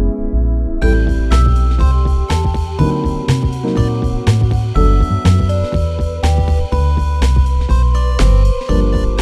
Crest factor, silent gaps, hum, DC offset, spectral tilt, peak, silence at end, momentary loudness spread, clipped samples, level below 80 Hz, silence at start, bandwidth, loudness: 12 dB; none; none; under 0.1%; -7 dB/octave; -2 dBFS; 0 s; 4 LU; under 0.1%; -14 dBFS; 0 s; 10.5 kHz; -15 LUFS